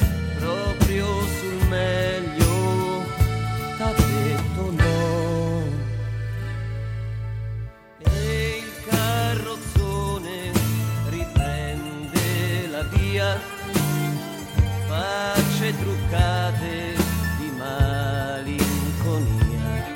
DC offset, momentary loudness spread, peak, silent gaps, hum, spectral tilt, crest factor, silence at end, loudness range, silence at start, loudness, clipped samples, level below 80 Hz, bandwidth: under 0.1%; 8 LU; -2 dBFS; none; none; -5.5 dB/octave; 20 dB; 0 s; 3 LU; 0 s; -24 LUFS; under 0.1%; -30 dBFS; 17 kHz